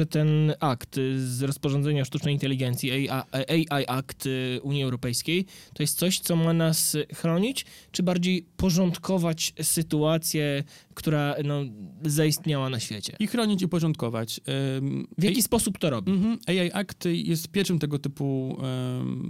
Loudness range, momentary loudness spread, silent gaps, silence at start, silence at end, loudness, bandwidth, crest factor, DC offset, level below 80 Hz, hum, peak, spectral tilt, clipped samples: 2 LU; 6 LU; none; 0 s; 0 s; -26 LUFS; 16.5 kHz; 16 dB; under 0.1%; -54 dBFS; none; -10 dBFS; -5 dB/octave; under 0.1%